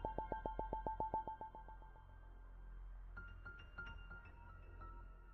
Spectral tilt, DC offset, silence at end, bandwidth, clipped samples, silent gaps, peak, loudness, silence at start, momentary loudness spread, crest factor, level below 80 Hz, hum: -5.5 dB/octave; under 0.1%; 0 s; 4.5 kHz; under 0.1%; none; -26 dBFS; -51 LUFS; 0 s; 16 LU; 24 dB; -56 dBFS; none